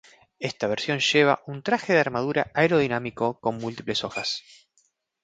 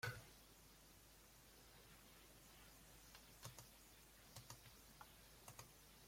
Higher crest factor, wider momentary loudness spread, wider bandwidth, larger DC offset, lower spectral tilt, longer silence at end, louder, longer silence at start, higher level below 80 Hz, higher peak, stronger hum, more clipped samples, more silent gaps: second, 20 dB vs 26 dB; about the same, 9 LU vs 7 LU; second, 9.2 kHz vs 16.5 kHz; neither; first, -4.5 dB/octave vs -3 dB/octave; first, 0.85 s vs 0 s; first, -24 LUFS vs -62 LUFS; first, 0.4 s vs 0 s; first, -62 dBFS vs -74 dBFS; first, -6 dBFS vs -36 dBFS; neither; neither; neither